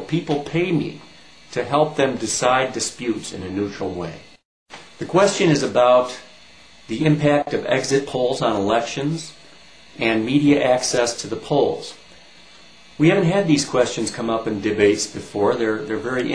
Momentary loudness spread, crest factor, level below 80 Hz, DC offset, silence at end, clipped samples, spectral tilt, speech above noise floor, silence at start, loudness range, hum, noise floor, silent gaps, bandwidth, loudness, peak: 12 LU; 20 dB; -54 dBFS; 0.3%; 0 s; under 0.1%; -5 dB/octave; 28 dB; 0 s; 3 LU; none; -48 dBFS; 4.45-4.66 s; 11 kHz; -20 LUFS; -2 dBFS